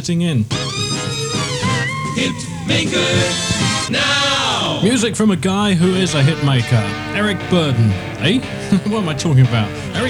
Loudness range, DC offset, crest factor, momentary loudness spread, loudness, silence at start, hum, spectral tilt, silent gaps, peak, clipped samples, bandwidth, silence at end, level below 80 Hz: 2 LU; under 0.1%; 14 dB; 6 LU; -16 LUFS; 0 s; none; -4.5 dB/octave; none; -2 dBFS; under 0.1%; 13 kHz; 0 s; -42 dBFS